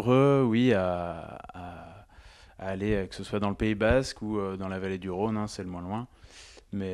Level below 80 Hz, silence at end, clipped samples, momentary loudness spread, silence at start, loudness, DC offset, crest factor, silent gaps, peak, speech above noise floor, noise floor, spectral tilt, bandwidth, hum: -46 dBFS; 0 s; under 0.1%; 20 LU; 0 s; -29 LUFS; under 0.1%; 18 dB; none; -10 dBFS; 25 dB; -53 dBFS; -7 dB/octave; 12 kHz; none